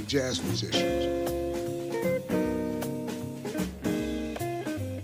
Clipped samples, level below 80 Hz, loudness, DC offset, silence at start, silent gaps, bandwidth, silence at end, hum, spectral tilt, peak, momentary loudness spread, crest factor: under 0.1%; -48 dBFS; -31 LUFS; under 0.1%; 0 s; none; 16.5 kHz; 0 s; none; -5 dB/octave; -14 dBFS; 6 LU; 16 dB